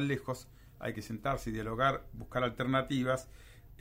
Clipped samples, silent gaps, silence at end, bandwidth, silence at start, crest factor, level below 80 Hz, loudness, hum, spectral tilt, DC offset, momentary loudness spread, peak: under 0.1%; none; 0 s; 16 kHz; 0 s; 18 dB; -52 dBFS; -35 LUFS; none; -6 dB/octave; under 0.1%; 11 LU; -16 dBFS